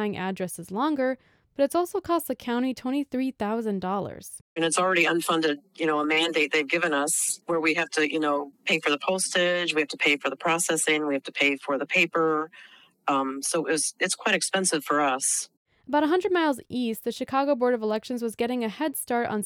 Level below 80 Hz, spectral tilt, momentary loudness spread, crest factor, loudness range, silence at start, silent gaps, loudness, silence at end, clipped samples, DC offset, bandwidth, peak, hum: -68 dBFS; -2.5 dB/octave; 7 LU; 18 dB; 4 LU; 0 s; 4.41-4.56 s, 15.57-15.65 s; -25 LUFS; 0 s; under 0.1%; under 0.1%; 19 kHz; -10 dBFS; none